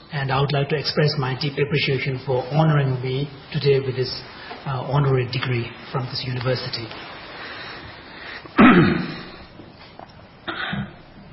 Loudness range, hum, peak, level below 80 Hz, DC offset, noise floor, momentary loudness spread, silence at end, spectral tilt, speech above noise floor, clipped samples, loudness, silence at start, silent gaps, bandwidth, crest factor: 4 LU; none; -2 dBFS; -48 dBFS; under 0.1%; -43 dBFS; 17 LU; 0 s; -10.5 dB/octave; 21 dB; under 0.1%; -21 LUFS; 0 s; none; 5.8 kHz; 20 dB